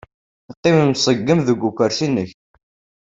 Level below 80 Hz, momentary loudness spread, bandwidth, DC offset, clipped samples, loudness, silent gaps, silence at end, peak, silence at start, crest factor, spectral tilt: -54 dBFS; 7 LU; 8 kHz; under 0.1%; under 0.1%; -17 LUFS; 0.57-0.63 s; 0.7 s; -2 dBFS; 0.5 s; 18 dB; -5.5 dB/octave